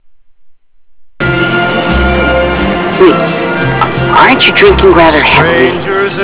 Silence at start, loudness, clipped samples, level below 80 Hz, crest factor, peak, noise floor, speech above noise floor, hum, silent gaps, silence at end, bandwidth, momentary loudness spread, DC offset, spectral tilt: 0.65 s; -7 LUFS; 3%; -22 dBFS; 8 dB; 0 dBFS; -40 dBFS; 34 dB; none; none; 0 s; 4 kHz; 8 LU; 1%; -9.5 dB/octave